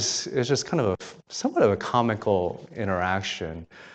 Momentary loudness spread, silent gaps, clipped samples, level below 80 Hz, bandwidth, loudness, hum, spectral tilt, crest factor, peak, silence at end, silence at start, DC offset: 11 LU; none; under 0.1%; -56 dBFS; 9 kHz; -26 LUFS; none; -4.5 dB/octave; 18 dB; -8 dBFS; 0 s; 0 s; under 0.1%